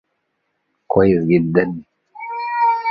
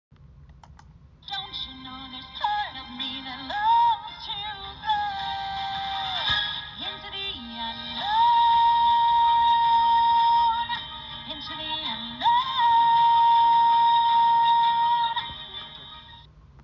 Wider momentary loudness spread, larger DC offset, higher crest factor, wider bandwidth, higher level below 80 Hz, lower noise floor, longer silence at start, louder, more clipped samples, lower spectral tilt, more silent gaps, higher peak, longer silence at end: about the same, 15 LU vs 16 LU; neither; first, 18 dB vs 12 dB; second, 5.8 kHz vs 6.8 kHz; first, -48 dBFS vs -54 dBFS; first, -71 dBFS vs -51 dBFS; first, 0.9 s vs 0.5 s; first, -17 LUFS vs -23 LUFS; neither; first, -11 dB/octave vs -3.5 dB/octave; neither; first, -2 dBFS vs -12 dBFS; second, 0 s vs 0.45 s